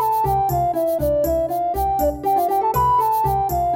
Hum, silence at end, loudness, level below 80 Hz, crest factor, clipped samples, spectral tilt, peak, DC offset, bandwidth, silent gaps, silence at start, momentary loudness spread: none; 0 s; -19 LUFS; -34 dBFS; 10 dB; under 0.1%; -7 dB/octave; -8 dBFS; under 0.1%; 17.5 kHz; none; 0 s; 4 LU